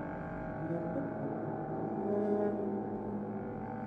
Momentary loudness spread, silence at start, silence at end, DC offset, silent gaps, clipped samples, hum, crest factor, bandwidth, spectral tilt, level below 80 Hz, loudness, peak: 8 LU; 0 s; 0 s; under 0.1%; none; under 0.1%; none; 16 dB; 4.8 kHz; -11 dB/octave; -60 dBFS; -37 LUFS; -20 dBFS